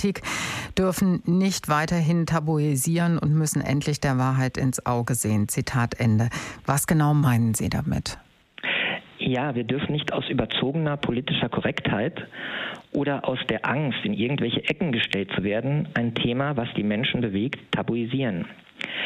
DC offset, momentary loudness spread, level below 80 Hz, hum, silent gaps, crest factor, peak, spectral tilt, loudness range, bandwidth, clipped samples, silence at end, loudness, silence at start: under 0.1%; 6 LU; -50 dBFS; none; none; 16 dB; -10 dBFS; -5 dB/octave; 3 LU; 15.5 kHz; under 0.1%; 0 s; -25 LUFS; 0 s